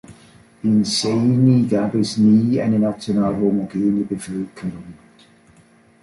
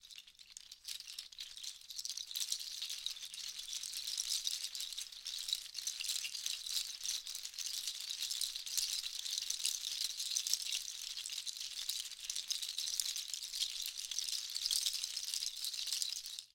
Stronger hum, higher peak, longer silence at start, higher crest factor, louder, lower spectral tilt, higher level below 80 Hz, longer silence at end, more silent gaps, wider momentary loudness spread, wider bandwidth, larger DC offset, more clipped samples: neither; first, -4 dBFS vs -12 dBFS; about the same, 0.1 s vs 0.05 s; second, 16 dB vs 30 dB; first, -18 LUFS vs -39 LUFS; first, -6.5 dB/octave vs 5 dB/octave; first, -54 dBFS vs -76 dBFS; first, 1.1 s vs 0.1 s; neither; first, 13 LU vs 9 LU; second, 11.5 kHz vs 17 kHz; neither; neither